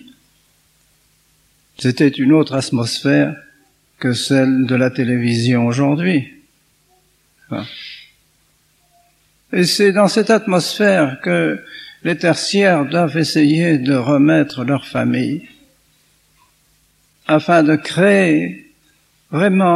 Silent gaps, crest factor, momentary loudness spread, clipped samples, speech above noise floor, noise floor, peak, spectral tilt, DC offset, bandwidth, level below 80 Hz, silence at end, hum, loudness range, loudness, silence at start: none; 16 dB; 14 LU; under 0.1%; 44 dB; -58 dBFS; 0 dBFS; -5.5 dB/octave; under 0.1%; 13.5 kHz; -62 dBFS; 0 s; none; 6 LU; -15 LUFS; 1.8 s